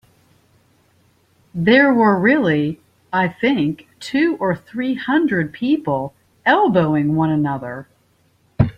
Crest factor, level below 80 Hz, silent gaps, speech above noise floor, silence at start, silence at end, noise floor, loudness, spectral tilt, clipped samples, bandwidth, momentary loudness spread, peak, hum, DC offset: 16 dB; -48 dBFS; none; 42 dB; 1.55 s; 0.05 s; -59 dBFS; -18 LUFS; -7.5 dB/octave; under 0.1%; 8.8 kHz; 12 LU; -2 dBFS; none; under 0.1%